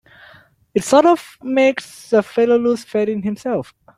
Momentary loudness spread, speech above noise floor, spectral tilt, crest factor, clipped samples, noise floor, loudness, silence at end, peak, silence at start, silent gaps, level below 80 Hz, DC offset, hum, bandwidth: 11 LU; 32 dB; -5 dB/octave; 16 dB; under 0.1%; -48 dBFS; -17 LUFS; 0.35 s; -2 dBFS; 0.75 s; none; -60 dBFS; under 0.1%; none; 15 kHz